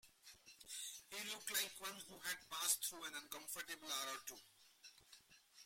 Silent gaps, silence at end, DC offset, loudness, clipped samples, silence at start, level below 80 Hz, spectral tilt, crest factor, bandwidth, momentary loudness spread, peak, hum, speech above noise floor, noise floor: none; 0 s; under 0.1%; -45 LUFS; under 0.1%; 0.05 s; -86 dBFS; 1 dB/octave; 28 dB; 16.5 kHz; 23 LU; -22 dBFS; none; 21 dB; -68 dBFS